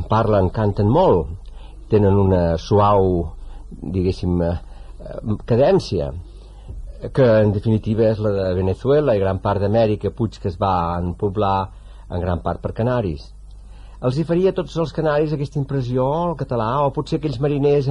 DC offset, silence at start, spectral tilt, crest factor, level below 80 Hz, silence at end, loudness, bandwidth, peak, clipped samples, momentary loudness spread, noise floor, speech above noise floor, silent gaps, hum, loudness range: under 0.1%; 0 s; -8.5 dB/octave; 14 dB; -34 dBFS; 0 s; -19 LUFS; 10 kHz; -4 dBFS; under 0.1%; 14 LU; -38 dBFS; 20 dB; none; none; 5 LU